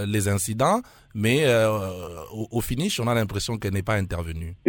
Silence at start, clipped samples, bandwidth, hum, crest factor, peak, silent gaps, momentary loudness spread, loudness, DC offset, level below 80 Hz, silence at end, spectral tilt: 0 s; under 0.1%; 19 kHz; none; 16 dB; -8 dBFS; none; 13 LU; -24 LUFS; under 0.1%; -44 dBFS; 0 s; -5 dB/octave